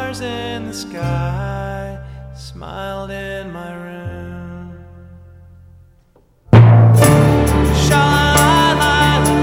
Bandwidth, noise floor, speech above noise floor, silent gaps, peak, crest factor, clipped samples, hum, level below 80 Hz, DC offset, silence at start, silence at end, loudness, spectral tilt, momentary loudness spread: 16.5 kHz; -52 dBFS; 28 dB; none; 0 dBFS; 14 dB; under 0.1%; none; -28 dBFS; under 0.1%; 0 s; 0 s; -13 LUFS; -5.5 dB/octave; 22 LU